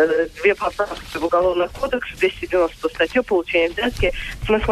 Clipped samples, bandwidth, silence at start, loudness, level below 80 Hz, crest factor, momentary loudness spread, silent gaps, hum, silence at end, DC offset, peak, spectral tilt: under 0.1%; 14 kHz; 0 s; -20 LUFS; -36 dBFS; 16 dB; 6 LU; none; none; 0 s; under 0.1%; -4 dBFS; -5 dB/octave